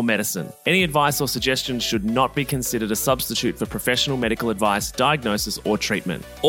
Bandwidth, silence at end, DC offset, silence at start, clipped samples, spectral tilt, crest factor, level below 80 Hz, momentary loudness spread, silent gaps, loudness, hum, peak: 17 kHz; 0 s; under 0.1%; 0 s; under 0.1%; -3.5 dB/octave; 18 dB; -44 dBFS; 4 LU; none; -21 LUFS; none; -4 dBFS